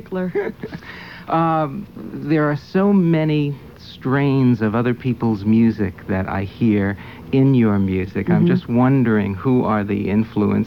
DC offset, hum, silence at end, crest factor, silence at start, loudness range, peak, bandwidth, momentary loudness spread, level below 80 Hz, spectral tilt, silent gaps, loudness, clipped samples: 0.2%; none; 0 s; 14 dB; 0.05 s; 2 LU; -4 dBFS; 6.2 kHz; 14 LU; -48 dBFS; -10 dB/octave; none; -18 LUFS; under 0.1%